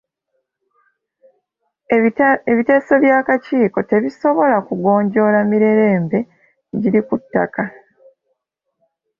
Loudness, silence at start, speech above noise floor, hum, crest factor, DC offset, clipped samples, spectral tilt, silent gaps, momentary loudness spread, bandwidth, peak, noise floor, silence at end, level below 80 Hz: -16 LUFS; 1.9 s; 59 dB; none; 14 dB; under 0.1%; under 0.1%; -9.5 dB/octave; none; 8 LU; 6.8 kHz; -2 dBFS; -74 dBFS; 1.5 s; -60 dBFS